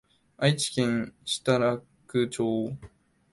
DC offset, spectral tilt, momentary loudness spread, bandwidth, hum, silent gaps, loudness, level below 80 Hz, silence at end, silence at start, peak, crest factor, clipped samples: under 0.1%; -5 dB/octave; 9 LU; 11.5 kHz; none; none; -28 LUFS; -62 dBFS; 0.45 s; 0.4 s; -10 dBFS; 20 dB; under 0.1%